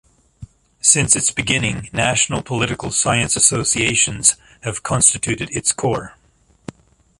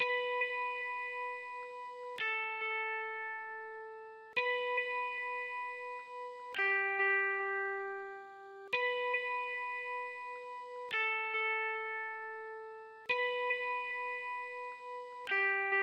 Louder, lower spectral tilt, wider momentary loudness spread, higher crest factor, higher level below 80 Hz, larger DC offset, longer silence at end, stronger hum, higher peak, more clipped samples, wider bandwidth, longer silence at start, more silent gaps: first, -16 LUFS vs -36 LUFS; about the same, -2.5 dB/octave vs -2 dB/octave; second, 9 LU vs 14 LU; about the same, 20 dB vs 18 dB; first, -44 dBFS vs -90 dBFS; neither; first, 1.1 s vs 0 s; neither; first, 0 dBFS vs -20 dBFS; neither; about the same, 12 kHz vs 11 kHz; first, 0.4 s vs 0 s; neither